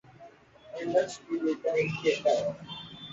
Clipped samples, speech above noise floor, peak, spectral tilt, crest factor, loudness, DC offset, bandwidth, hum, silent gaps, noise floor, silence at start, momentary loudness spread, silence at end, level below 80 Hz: under 0.1%; 25 dB; -14 dBFS; -5 dB/octave; 18 dB; -29 LUFS; under 0.1%; 8 kHz; none; none; -53 dBFS; 0.2 s; 14 LU; 0 s; -68 dBFS